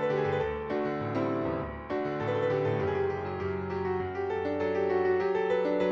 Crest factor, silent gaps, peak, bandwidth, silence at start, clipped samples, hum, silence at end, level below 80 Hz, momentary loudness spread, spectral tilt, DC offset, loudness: 14 dB; none; -16 dBFS; 7 kHz; 0 s; under 0.1%; none; 0 s; -54 dBFS; 6 LU; -8 dB/octave; under 0.1%; -30 LUFS